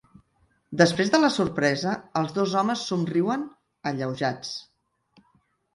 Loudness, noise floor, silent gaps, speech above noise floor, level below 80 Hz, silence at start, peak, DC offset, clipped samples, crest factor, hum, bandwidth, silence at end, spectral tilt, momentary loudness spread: -25 LUFS; -67 dBFS; none; 43 dB; -62 dBFS; 0.7 s; -2 dBFS; under 0.1%; under 0.1%; 24 dB; none; 11.5 kHz; 1.15 s; -5 dB/octave; 13 LU